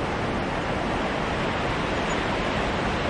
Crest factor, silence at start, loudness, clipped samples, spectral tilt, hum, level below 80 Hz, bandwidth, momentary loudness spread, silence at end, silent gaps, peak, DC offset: 14 dB; 0 s; -26 LUFS; under 0.1%; -5.5 dB/octave; none; -38 dBFS; 11 kHz; 1 LU; 0 s; none; -12 dBFS; under 0.1%